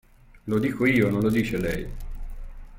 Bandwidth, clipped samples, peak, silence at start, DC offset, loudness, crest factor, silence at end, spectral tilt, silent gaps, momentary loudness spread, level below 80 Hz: 17 kHz; under 0.1%; -8 dBFS; 0.35 s; under 0.1%; -24 LUFS; 18 dB; 0 s; -7 dB/octave; none; 21 LU; -38 dBFS